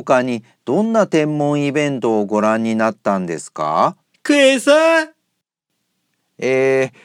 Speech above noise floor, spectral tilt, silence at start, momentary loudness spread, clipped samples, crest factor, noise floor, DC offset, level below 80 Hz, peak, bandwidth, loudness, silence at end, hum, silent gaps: 58 dB; -5 dB/octave; 0 s; 11 LU; under 0.1%; 16 dB; -74 dBFS; under 0.1%; -70 dBFS; 0 dBFS; 15 kHz; -16 LUFS; 0.15 s; 60 Hz at -55 dBFS; none